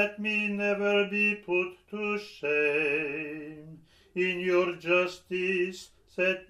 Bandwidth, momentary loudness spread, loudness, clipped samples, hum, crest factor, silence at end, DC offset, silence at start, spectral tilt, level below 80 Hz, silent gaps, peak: 12 kHz; 13 LU; -28 LUFS; under 0.1%; none; 18 dB; 0.05 s; under 0.1%; 0 s; -5.5 dB/octave; -68 dBFS; none; -12 dBFS